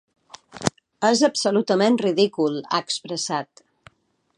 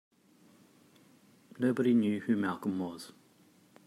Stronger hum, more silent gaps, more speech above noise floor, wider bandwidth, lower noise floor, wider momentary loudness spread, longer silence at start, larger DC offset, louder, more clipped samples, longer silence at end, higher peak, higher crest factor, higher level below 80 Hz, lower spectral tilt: neither; neither; first, 38 dB vs 33 dB; second, 11 kHz vs 13 kHz; second, -59 dBFS vs -64 dBFS; second, 9 LU vs 15 LU; second, 0.55 s vs 1.6 s; neither; first, -22 LUFS vs -31 LUFS; neither; first, 0.95 s vs 0.75 s; first, 0 dBFS vs -18 dBFS; first, 24 dB vs 18 dB; first, -60 dBFS vs -80 dBFS; second, -4 dB/octave vs -7 dB/octave